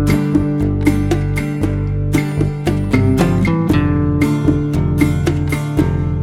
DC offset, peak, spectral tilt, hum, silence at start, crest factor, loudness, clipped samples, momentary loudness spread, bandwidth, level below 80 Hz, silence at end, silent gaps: under 0.1%; -2 dBFS; -7.5 dB/octave; none; 0 s; 14 dB; -16 LUFS; under 0.1%; 4 LU; 15.5 kHz; -26 dBFS; 0 s; none